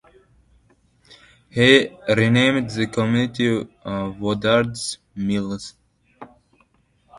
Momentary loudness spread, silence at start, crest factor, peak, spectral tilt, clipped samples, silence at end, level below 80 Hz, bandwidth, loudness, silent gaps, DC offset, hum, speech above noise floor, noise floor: 15 LU; 1.55 s; 22 dB; 0 dBFS; -5 dB/octave; under 0.1%; 0 s; -52 dBFS; 11.5 kHz; -20 LUFS; none; under 0.1%; none; 42 dB; -61 dBFS